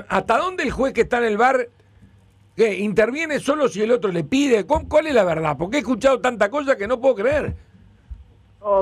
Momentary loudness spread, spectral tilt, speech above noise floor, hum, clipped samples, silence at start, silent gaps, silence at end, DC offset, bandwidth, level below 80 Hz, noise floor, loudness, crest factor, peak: 5 LU; -5.5 dB/octave; 33 dB; none; under 0.1%; 0 s; none; 0 s; under 0.1%; 13 kHz; -44 dBFS; -53 dBFS; -20 LUFS; 14 dB; -6 dBFS